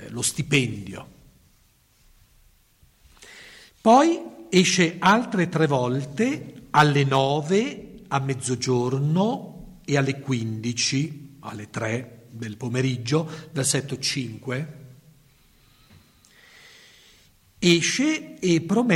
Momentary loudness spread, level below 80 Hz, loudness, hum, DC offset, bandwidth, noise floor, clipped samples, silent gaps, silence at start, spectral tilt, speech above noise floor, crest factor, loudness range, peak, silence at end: 18 LU; -58 dBFS; -23 LUFS; none; under 0.1%; 16 kHz; -60 dBFS; under 0.1%; none; 0 s; -4.5 dB/octave; 38 dB; 18 dB; 9 LU; -6 dBFS; 0 s